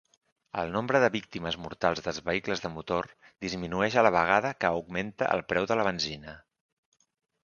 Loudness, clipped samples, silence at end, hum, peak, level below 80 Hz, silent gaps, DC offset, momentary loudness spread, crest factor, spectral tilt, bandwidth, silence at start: -29 LUFS; under 0.1%; 1.05 s; none; -4 dBFS; -58 dBFS; none; under 0.1%; 11 LU; 24 dB; -5 dB/octave; 7.2 kHz; 0.55 s